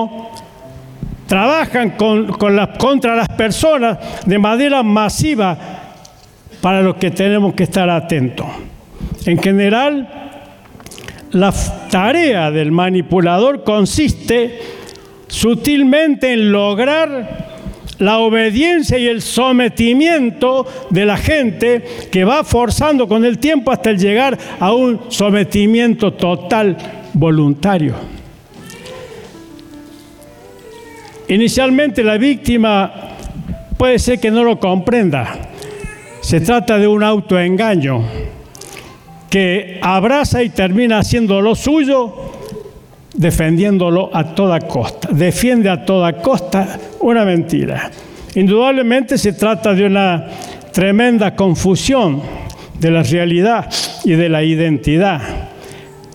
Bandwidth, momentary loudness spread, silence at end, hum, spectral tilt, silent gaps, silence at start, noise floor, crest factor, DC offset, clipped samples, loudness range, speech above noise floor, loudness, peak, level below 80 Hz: 17.5 kHz; 17 LU; 0.05 s; none; -5.5 dB/octave; none; 0 s; -41 dBFS; 10 dB; under 0.1%; under 0.1%; 3 LU; 28 dB; -13 LUFS; -4 dBFS; -34 dBFS